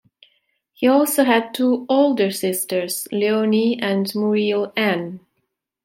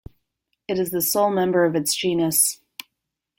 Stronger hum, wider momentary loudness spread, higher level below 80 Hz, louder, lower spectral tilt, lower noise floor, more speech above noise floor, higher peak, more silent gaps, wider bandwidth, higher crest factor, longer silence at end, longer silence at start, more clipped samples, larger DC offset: neither; second, 6 LU vs 20 LU; second, -72 dBFS vs -58 dBFS; about the same, -19 LUFS vs -20 LUFS; about the same, -4.5 dB/octave vs -3.5 dB/octave; second, -74 dBFS vs -81 dBFS; second, 55 dB vs 61 dB; about the same, -2 dBFS vs -4 dBFS; neither; about the same, 16.5 kHz vs 17 kHz; about the same, 18 dB vs 20 dB; second, 0.65 s vs 0.85 s; about the same, 0.8 s vs 0.7 s; neither; neither